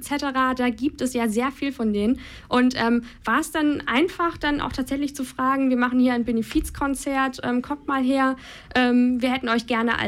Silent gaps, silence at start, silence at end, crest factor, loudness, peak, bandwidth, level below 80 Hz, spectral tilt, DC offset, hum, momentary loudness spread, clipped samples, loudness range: none; 0 s; 0 s; 16 dB; -23 LUFS; -6 dBFS; 15 kHz; -44 dBFS; -4.5 dB/octave; under 0.1%; none; 6 LU; under 0.1%; 1 LU